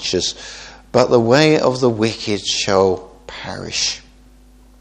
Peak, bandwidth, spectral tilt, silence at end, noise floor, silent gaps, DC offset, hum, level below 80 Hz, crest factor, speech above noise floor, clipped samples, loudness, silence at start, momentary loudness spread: 0 dBFS; 9.6 kHz; -4 dB/octave; 0.8 s; -46 dBFS; none; under 0.1%; none; -46 dBFS; 18 dB; 30 dB; under 0.1%; -16 LUFS; 0 s; 19 LU